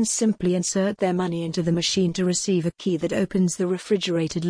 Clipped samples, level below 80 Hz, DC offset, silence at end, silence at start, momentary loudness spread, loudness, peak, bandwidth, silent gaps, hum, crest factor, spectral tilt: under 0.1%; -54 dBFS; under 0.1%; 0 s; 0 s; 4 LU; -23 LUFS; -10 dBFS; 10.5 kHz; none; none; 14 dB; -5 dB/octave